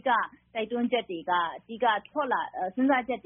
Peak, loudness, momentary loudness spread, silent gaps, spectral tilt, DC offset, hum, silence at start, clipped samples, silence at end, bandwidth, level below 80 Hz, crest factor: -12 dBFS; -29 LUFS; 7 LU; none; 1.5 dB/octave; under 0.1%; none; 0.05 s; under 0.1%; 0.05 s; 3.8 kHz; -70 dBFS; 16 dB